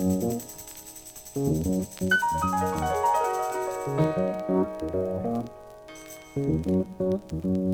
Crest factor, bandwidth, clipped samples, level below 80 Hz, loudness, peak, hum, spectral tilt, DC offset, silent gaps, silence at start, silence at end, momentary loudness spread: 16 dB; over 20 kHz; under 0.1%; -50 dBFS; -27 LUFS; -12 dBFS; none; -6 dB/octave; under 0.1%; none; 0 s; 0 s; 16 LU